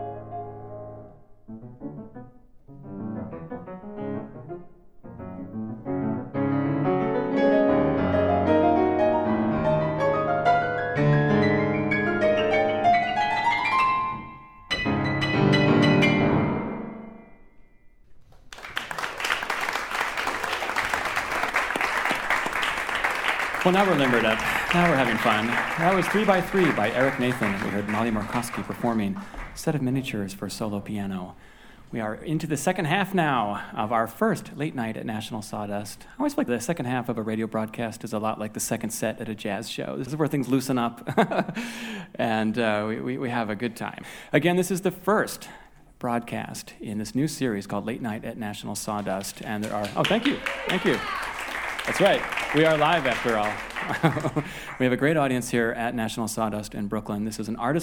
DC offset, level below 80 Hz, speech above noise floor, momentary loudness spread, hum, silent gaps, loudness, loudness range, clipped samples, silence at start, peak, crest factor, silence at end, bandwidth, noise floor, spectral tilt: under 0.1%; -50 dBFS; 26 dB; 15 LU; none; none; -25 LUFS; 8 LU; under 0.1%; 0 s; -4 dBFS; 22 dB; 0 s; over 20 kHz; -51 dBFS; -5.5 dB/octave